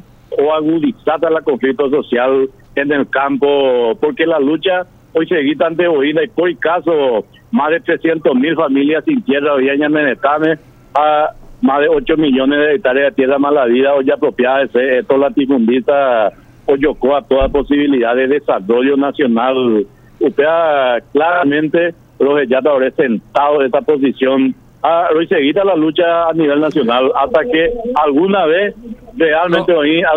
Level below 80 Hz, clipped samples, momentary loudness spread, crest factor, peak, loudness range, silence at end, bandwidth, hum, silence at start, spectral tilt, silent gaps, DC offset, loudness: -42 dBFS; under 0.1%; 4 LU; 12 dB; 0 dBFS; 2 LU; 0 s; 4.2 kHz; none; 0.3 s; -7.5 dB/octave; none; under 0.1%; -13 LUFS